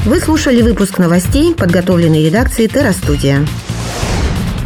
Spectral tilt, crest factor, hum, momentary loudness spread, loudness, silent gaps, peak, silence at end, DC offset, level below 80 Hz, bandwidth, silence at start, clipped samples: -6 dB/octave; 10 dB; none; 7 LU; -12 LUFS; none; 0 dBFS; 0 s; under 0.1%; -22 dBFS; 19 kHz; 0 s; under 0.1%